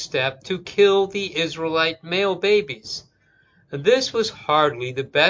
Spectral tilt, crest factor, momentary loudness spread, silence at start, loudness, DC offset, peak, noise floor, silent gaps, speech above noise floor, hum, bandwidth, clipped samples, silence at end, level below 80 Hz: -4 dB/octave; 20 dB; 12 LU; 0 s; -21 LUFS; under 0.1%; -2 dBFS; -60 dBFS; none; 39 dB; none; 7.6 kHz; under 0.1%; 0 s; -60 dBFS